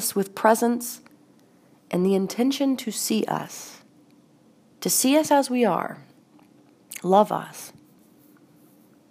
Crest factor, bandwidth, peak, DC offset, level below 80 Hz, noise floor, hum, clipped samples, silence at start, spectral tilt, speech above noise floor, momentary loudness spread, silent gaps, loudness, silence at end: 22 dB; 15.5 kHz; -2 dBFS; under 0.1%; -78 dBFS; -57 dBFS; none; under 0.1%; 0 s; -4 dB/octave; 34 dB; 20 LU; none; -23 LUFS; 1.4 s